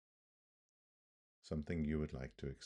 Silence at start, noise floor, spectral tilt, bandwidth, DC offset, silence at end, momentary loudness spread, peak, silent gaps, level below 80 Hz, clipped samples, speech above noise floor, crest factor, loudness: 1.45 s; under -90 dBFS; -7.5 dB/octave; 9.6 kHz; under 0.1%; 0 s; 7 LU; -28 dBFS; none; -58 dBFS; under 0.1%; over 48 dB; 18 dB; -43 LUFS